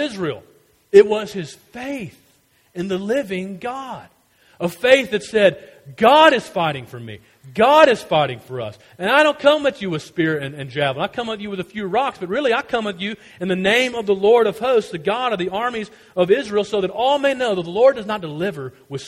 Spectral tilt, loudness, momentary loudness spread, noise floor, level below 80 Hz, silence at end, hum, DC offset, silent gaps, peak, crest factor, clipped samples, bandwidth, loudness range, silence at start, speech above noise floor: -5 dB/octave; -18 LUFS; 17 LU; -58 dBFS; -58 dBFS; 0 s; none; under 0.1%; none; 0 dBFS; 20 dB; under 0.1%; 15.5 kHz; 6 LU; 0 s; 40 dB